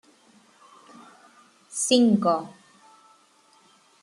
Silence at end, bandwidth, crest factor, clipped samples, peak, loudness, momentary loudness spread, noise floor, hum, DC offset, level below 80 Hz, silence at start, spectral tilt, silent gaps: 1.55 s; 12.5 kHz; 22 dB; under 0.1%; -6 dBFS; -22 LUFS; 17 LU; -59 dBFS; none; under 0.1%; -74 dBFS; 1.7 s; -4 dB/octave; none